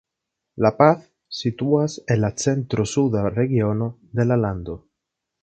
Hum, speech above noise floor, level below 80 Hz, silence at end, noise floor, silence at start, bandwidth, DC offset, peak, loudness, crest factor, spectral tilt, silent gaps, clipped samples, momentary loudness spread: none; 62 dB; -48 dBFS; 0.65 s; -82 dBFS; 0.55 s; 9 kHz; under 0.1%; 0 dBFS; -21 LUFS; 22 dB; -6.5 dB/octave; none; under 0.1%; 10 LU